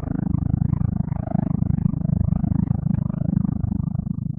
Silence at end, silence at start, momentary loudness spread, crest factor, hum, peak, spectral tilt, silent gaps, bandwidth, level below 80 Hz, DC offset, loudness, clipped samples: 0 s; 0 s; 3 LU; 16 dB; none; -6 dBFS; -14.5 dB/octave; none; 2.4 kHz; -34 dBFS; under 0.1%; -23 LUFS; under 0.1%